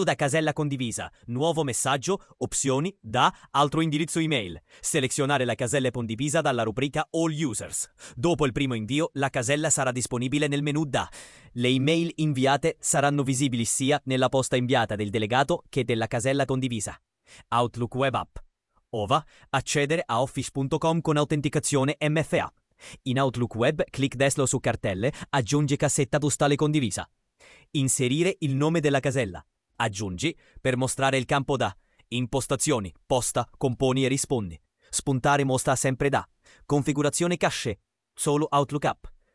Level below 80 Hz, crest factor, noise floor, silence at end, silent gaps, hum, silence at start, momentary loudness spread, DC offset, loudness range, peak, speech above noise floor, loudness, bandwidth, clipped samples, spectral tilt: -54 dBFS; 20 dB; -56 dBFS; 0.25 s; none; none; 0 s; 7 LU; under 0.1%; 2 LU; -6 dBFS; 30 dB; -26 LUFS; 12 kHz; under 0.1%; -4.5 dB/octave